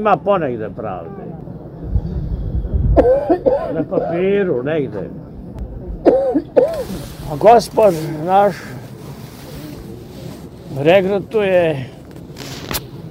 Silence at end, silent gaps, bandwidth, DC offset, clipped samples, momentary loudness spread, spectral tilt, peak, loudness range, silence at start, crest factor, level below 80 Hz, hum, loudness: 0 s; none; 16 kHz; under 0.1%; under 0.1%; 19 LU; -6.5 dB/octave; 0 dBFS; 4 LU; 0 s; 18 dB; -30 dBFS; none; -16 LUFS